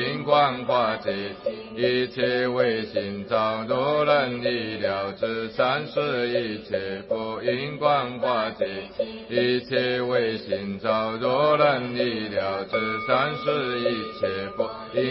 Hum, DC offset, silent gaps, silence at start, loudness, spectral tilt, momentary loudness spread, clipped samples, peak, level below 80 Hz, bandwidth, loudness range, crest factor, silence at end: none; under 0.1%; none; 0 s; -25 LUFS; -9.5 dB/octave; 9 LU; under 0.1%; -6 dBFS; -58 dBFS; 5.8 kHz; 2 LU; 20 dB; 0 s